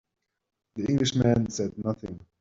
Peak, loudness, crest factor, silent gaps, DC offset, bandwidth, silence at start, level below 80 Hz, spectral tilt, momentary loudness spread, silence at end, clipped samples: -10 dBFS; -27 LUFS; 20 dB; none; under 0.1%; 7.8 kHz; 0.75 s; -54 dBFS; -6 dB/octave; 15 LU; 0.2 s; under 0.1%